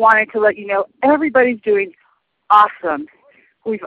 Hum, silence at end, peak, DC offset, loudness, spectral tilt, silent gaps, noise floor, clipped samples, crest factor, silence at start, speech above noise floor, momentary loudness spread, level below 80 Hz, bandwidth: none; 0 s; 0 dBFS; under 0.1%; -16 LUFS; -6.5 dB/octave; none; -61 dBFS; under 0.1%; 16 dB; 0 s; 46 dB; 14 LU; -62 dBFS; 6.8 kHz